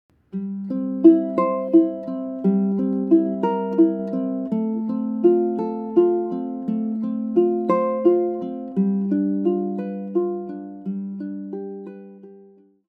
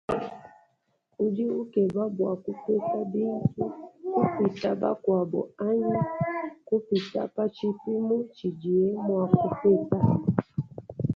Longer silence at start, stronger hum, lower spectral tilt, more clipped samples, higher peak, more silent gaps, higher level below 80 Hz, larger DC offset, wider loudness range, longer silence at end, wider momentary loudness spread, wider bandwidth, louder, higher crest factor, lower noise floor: first, 0.35 s vs 0.1 s; neither; first, -11.5 dB/octave vs -9.5 dB/octave; neither; first, -2 dBFS vs -6 dBFS; neither; second, -68 dBFS vs -58 dBFS; neither; first, 6 LU vs 3 LU; first, 0.45 s vs 0 s; first, 13 LU vs 9 LU; second, 3.1 kHz vs 6.8 kHz; first, -21 LUFS vs -27 LUFS; about the same, 20 dB vs 20 dB; second, -51 dBFS vs -72 dBFS